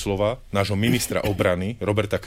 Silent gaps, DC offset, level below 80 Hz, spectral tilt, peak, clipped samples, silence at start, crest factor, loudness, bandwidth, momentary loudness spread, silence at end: none; 0.2%; -42 dBFS; -5.5 dB/octave; -8 dBFS; under 0.1%; 0 s; 16 dB; -23 LUFS; 16 kHz; 3 LU; 0 s